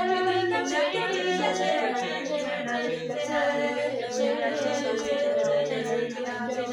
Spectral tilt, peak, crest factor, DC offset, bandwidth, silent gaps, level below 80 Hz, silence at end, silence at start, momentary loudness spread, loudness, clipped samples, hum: -3.5 dB/octave; -12 dBFS; 14 dB; under 0.1%; 11.5 kHz; none; -68 dBFS; 0 s; 0 s; 5 LU; -27 LUFS; under 0.1%; none